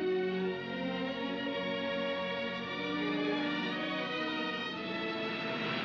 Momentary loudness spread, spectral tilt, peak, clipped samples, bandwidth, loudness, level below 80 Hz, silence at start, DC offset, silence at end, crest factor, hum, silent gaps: 4 LU; -6 dB/octave; -22 dBFS; under 0.1%; 7.4 kHz; -35 LUFS; -72 dBFS; 0 s; under 0.1%; 0 s; 14 dB; none; none